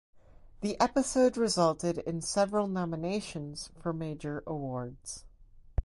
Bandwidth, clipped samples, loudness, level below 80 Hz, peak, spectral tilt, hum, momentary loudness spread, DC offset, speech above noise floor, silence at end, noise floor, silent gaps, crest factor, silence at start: 11.5 kHz; under 0.1%; -31 LUFS; -46 dBFS; -12 dBFS; -5 dB/octave; none; 13 LU; under 0.1%; 24 dB; 0 s; -55 dBFS; none; 20 dB; 0.15 s